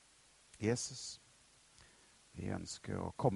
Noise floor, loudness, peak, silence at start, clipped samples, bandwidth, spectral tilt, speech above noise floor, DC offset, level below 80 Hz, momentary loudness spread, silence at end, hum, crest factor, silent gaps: -67 dBFS; -41 LUFS; -18 dBFS; 0.55 s; under 0.1%; 11.5 kHz; -5 dB/octave; 28 dB; under 0.1%; -66 dBFS; 25 LU; 0 s; none; 24 dB; none